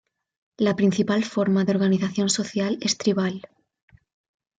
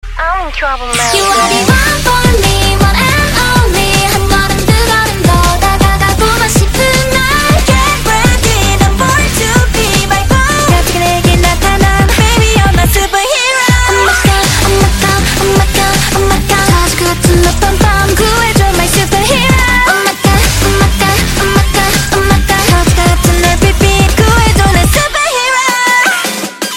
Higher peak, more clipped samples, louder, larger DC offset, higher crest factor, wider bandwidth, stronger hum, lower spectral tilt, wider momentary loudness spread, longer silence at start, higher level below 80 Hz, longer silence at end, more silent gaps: second, -8 dBFS vs 0 dBFS; second, under 0.1% vs 0.1%; second, -23 LUFS vs -9 LUFS; neither; first, 16 dB vs 8 dB; second, 9.4 kHz vs 17.5 kHz; neither; about the same, -5 dB/octave vs -4 dB/octave; first, 5 LU vs 2 LU; first, 0.6 s vs 0.05 s; second, -64 dBFS vs -16 dBFS; first, 1.2 s vs 0 s; neither